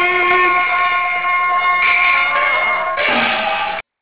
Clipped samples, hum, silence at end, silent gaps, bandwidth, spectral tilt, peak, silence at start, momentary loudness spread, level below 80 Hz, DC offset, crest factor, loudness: under 0.1%; none; 0.2 s; none; 4 kHz; -5 dB/octave; -2 dBFS; 0 s; 5 LU; -52 dBFS; 0.8%; 12 dB; -14 LUFS